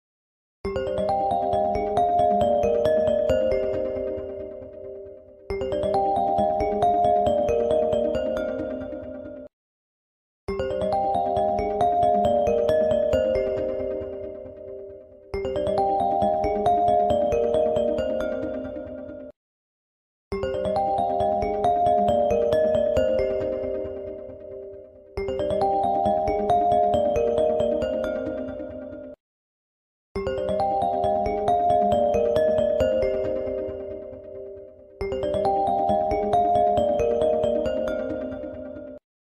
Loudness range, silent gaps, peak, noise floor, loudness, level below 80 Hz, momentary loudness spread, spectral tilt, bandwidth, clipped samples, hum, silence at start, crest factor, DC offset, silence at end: 6 LU; 9.53-10.47 s, 19.36-20.31 s, 29.20-30.15 s; -10 dBFS; -43 dBFS; -23 LUFS; -44 dBFS; 17 LU; -7 dB/octave; 10 kHz; under 0.1%; none; 0.65 s; 14 dB; under 0.1%; 0.3 s